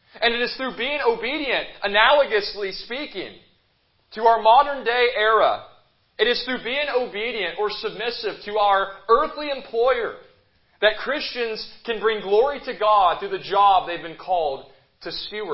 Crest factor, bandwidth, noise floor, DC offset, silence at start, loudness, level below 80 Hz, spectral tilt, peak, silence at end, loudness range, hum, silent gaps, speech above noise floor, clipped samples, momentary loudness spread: 22 dB; 5.8 kHz; -65 dBFS; under 0.1%; 0.15 s; -21 LUFS; -54 dBFS; -6.5 dB/octave; 0 dBFS; 0 s; 3 LU; none; none; 43 dB; under 0.1%; 13 LU